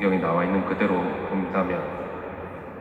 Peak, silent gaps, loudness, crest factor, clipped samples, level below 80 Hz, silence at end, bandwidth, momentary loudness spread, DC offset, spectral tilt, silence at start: -8 dBFS; none; -26 LUFS; 16 dB; under 0.1%; -54 dBFS; 0 s; 4.8 kHz; 12 LU; under 0.1%; -9 dB/octave; 0 s